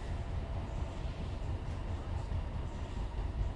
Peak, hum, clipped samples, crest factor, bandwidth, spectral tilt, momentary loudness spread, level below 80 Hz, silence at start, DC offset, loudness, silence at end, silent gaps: -22 dBFS; none; under 0.1%; 14 dB; 10.5 kHz; -7 dB/octave; 2 LU; -40 dBFS; 0 s; under 0.1%; -41 LUFS; 0 s; none